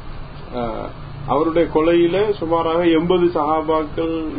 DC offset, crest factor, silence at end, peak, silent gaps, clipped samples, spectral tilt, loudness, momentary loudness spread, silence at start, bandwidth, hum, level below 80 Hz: under 0.1%; 16 dB; 0 s; -2 dBFS; none; under 0.1%; -11.5 dB/octave; -18 LUFS; 15 LU; 0 s; 5 kHz; none; -38 dBFS